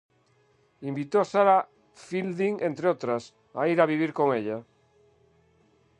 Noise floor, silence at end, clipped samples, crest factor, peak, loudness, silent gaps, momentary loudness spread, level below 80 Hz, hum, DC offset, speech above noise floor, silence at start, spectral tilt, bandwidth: -65 dBFS; 1.4 s; under 0.1%; 22 dB; -6 dBFS; -26 LUFS; none; 14 LU; -76 dBFS; none; under 0.1%; 40 dB; 0.8 s; -7 dB/octave; 9.8 kHz